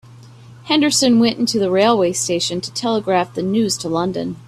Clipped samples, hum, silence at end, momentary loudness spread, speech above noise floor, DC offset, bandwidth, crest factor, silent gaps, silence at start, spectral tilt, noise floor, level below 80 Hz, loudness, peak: under 0.1%; none; 0 s; 7 LU; 24 dB; under 0.1%; 14 kHz; 16 dB; none; 0.1 s; -4 dB/octave; -41 dBFS; -56 dBFS; -17 LUFS; -2 dBFS